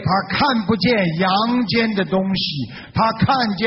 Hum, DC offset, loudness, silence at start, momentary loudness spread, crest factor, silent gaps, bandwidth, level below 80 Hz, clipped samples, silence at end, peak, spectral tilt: none; under 0.1%; -18 LUFS; 0 s; 4 LU; 12 dB; none; 6 kHz; -46 dBFS; under 0.1%; 0 s; -6 dBFS; -4 dB/octave